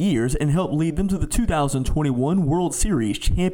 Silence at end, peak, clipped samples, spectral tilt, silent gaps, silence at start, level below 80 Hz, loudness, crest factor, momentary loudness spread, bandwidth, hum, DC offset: 0 s; -8 dBFS; under 0.1%; -6 dB/octave; none; 0 s; -28 dBFS; -22 LUFS; 12 dB; 2 LU; 18 kHz; none; 0.3%